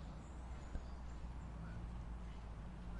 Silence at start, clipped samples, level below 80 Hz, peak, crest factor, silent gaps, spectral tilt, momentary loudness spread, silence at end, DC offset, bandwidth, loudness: 0 s; under 0.1%; -50 dBFS; -30 dBFS; 18 dB; none; -7 dB/octave; 2 LU; 0 s; under 0.1%; 10.5 kHz; -52 LUFS